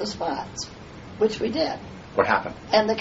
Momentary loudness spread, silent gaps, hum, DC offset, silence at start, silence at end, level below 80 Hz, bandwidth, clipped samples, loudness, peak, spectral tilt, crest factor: 14 LU; none; none; under 0.1%; 0 s; 0 s; -52 dBFS; 8 kHz; under 0.1%; -25 LUFS; -4 dBFS; -2.5 dB/octave; 20 dB